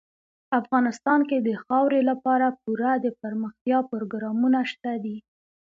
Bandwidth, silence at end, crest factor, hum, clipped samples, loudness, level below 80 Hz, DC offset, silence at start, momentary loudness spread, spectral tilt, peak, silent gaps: 7.6 kHz; 0.4 s; 16 dB; none; under 0.1%; -24 LUFS; -74 dBFS; under 0.1%; 0.5 s; 9 LU; -6.5 dB/octave; -8 dBFS; 3.61-3.65 s